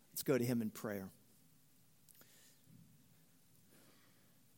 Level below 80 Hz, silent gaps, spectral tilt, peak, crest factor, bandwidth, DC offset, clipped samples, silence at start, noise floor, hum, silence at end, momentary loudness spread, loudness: -84 dBFS; none; -5.5 dB/octave; -22 dBFS; 24 dB; 17 kHz; under 0.1%; under 0.1%; 0.15 s; -71 dBFS; none; 2.35 s; 29 LU; -40 LUFS